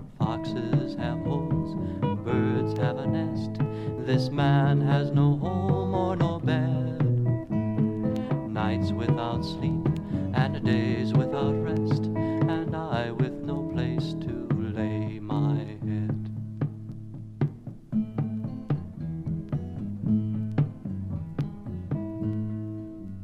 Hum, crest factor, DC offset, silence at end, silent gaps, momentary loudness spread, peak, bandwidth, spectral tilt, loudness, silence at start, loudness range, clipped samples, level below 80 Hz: none; 18 dB; under 0.1%; 0 s; none; 9 LU; -10 dBFS; 7.6 kHz; -9 dB/octave; -28 LUFS; 0 s; 6 LU; under 0.1%; -50 dBFS